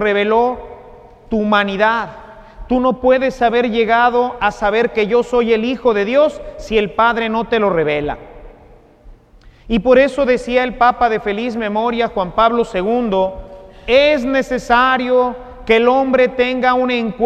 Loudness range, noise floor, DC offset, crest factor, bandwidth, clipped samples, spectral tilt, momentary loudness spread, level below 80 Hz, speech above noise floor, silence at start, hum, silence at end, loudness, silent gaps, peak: 3 LU; -45 dBFS; under 0.1%; 16 dB; 9.2 kHz; under 0.1%; -5.5 dB/octave; 8 LU; -38 dBFS; 30 dB; 0 s; none; 0 s; -15 LUFS; none; 0 dBFS